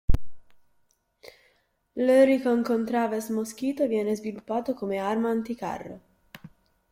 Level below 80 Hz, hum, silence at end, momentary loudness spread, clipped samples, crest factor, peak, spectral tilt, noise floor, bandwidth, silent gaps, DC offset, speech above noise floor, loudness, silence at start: -40 dBFS; none; 0.45 s; 14 LU; under 0.1%; 20 dB; -6 dBFS; -6.5 dB/octave; -69 dBFS; 15.5 kHz; none; under 0.1%; 43 dB; -26 LUFS; 0.1 s